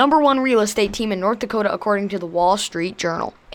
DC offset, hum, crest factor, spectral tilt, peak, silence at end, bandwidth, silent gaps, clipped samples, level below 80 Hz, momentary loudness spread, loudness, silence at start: under 0.1%; none; 16 dB; -4 dB/octave; -4 dBFS; 0 s; 19 kHz; none; under 0.1%; -48 dBFS; 8 LU; -20 LUFS; 0 s